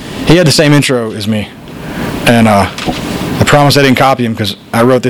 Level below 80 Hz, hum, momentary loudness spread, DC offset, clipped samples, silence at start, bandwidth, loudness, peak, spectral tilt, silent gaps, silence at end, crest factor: -34 dBFS; none; 11 LU; under 0.1%; 1%; 0 s; over 20 kHz; -9 LUFS; 0 dBFS; -5 dB/octave; none; 0 s; 10 dB